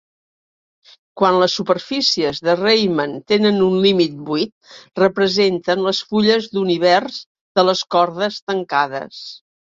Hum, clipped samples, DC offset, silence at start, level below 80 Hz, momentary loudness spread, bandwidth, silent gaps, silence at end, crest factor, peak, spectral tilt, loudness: none; under 0.1%; under 0.1%; 1.15 s; -60 dBFS; 9 LU; 7.6 kHz; 4.52-4.61 s, 7.26-7.35 s, 7.41-7.55 s, 8.42-8.47 s; 0.35 s; 16 dB; -2 dBFS; -5 dB/octave; -17 LUFS